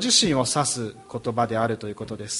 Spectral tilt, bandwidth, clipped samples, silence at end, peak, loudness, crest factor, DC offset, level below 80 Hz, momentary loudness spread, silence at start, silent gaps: -3 dB/octave; 11.5 kHz; under 0.1%; 0 s; -6 dBFS; -24 LUFS; 18 dB; under 0.1%; -54 dBFS; 15 LU; 0 s; none